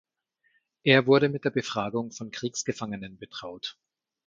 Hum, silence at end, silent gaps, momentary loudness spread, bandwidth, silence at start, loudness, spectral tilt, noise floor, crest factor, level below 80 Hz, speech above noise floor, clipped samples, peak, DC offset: none; 0.55 s; none; 18 LU; 7.6 kHz; 0.85 s; -26 LUFS; -4.5 dB/octave; -73 dBFS; 22 dB; -68 dBFS; 46 dB; under 0.1%; -6 dBFS; under 0.1%